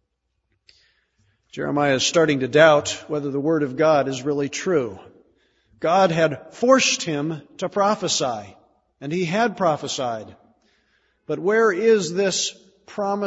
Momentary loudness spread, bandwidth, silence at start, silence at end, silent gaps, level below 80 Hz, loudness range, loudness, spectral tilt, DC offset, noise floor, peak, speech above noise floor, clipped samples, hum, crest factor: 12 LU; 8 kHz; 1.55 s; 0 s; none; -64 dBFS; 5 LU; -20 LUFS; -4 dB/octave; under 0.1%; -74 dBFS; 0 dBFS; 54 dB; under 0.1%; none; 20 dB